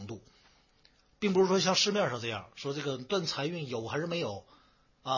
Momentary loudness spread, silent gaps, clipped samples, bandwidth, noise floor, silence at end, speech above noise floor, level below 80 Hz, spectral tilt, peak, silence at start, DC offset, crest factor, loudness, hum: 15 LU; none; under 0.1%; 7.4 kHz; -66 dBFS; 0 s; 35 dB; -68 dBFS; -4 dB/octave; -14 dBFS; 0 s; under 0.1%; 20 dB; -31 LUFS; none